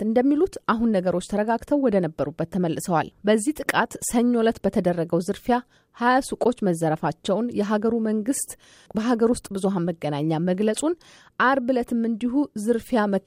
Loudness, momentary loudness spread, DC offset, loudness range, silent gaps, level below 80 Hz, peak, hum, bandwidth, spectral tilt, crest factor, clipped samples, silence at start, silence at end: -23 LUFS; 5 LU; under 0.1%; 2 LU; none; -54 dBFS; -6 dBFS; none; 16 kHz; -5.5 dB/octave; 16 dB; under 0.1%; 0 s; 0.05 s